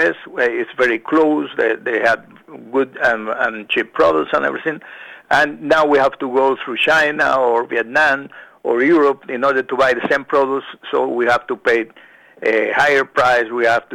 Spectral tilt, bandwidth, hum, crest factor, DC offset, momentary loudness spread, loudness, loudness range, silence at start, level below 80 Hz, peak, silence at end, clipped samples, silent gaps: -4.5 dB/octave; 13.5 kHz; none; 16 dB; under 0.1%; 9 LU; -16 LUFS; 2 LU; 0 s; -54 dBFS; -2 dBFS; 0 s; under 0.1%; none